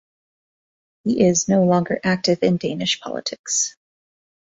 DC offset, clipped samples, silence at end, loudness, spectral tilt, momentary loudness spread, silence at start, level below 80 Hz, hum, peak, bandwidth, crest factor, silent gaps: under 0.1%; under 0.1%; 0.9 s; -20 LUFS; -4 dB/octave; 8 LU; 1.05 s; -58 dBFS; none; -4 dBFS; 8 kHz; 18 dB; 3.39-3.44 s